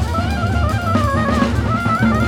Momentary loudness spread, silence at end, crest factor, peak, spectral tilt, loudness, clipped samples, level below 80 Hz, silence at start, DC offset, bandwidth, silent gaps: 3 LU; 0 s; 14 dB; -2 dBFS; -7 dB/octave; -17 LUFS; under 0.1%; -24 dBFS; 0 s; under 0.1%; 16 kHz; none